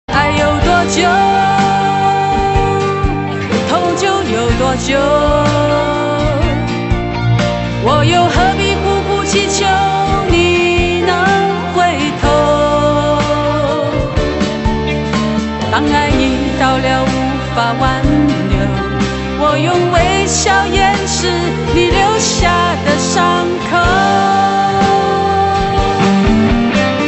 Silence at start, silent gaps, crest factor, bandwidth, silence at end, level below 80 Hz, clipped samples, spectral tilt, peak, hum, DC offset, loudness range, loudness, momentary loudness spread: 0.1 s; none; 12 dB; 8.4 kHz; 0 s; -24 dBFS; under 0.1%; -5 dB/octave; 0 dBFS; none; under 0.1%; 2 LU; -13 LUFS; 5 LU